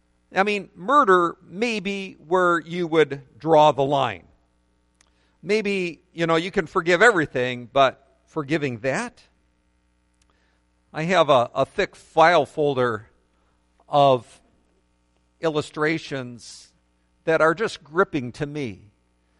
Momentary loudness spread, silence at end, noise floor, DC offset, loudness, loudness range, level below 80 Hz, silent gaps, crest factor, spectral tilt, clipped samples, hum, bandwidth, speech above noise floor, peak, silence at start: 15 LU; 0.65 s; -65 dBFS; under 0.1%; -22 LUFS; 5 LU; -58 dBFS; none; 20 dB; -5.5 dB/octave; under 0.1%; 60 Hz at -60 dBFS; 11.5 kHz; 44 dB; -2 dBFS; 0.3 s